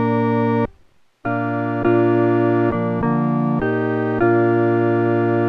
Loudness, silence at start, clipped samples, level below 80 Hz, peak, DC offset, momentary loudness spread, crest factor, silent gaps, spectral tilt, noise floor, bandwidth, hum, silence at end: -18 LUFS; 0 s; under 0.1%; -48 dBFS; -6 dBFS; under 0.1%; 6 LU; 12 dB; none; -10.5 dB/octave; -53 dBFS; 4.9 kHz; none; 0 s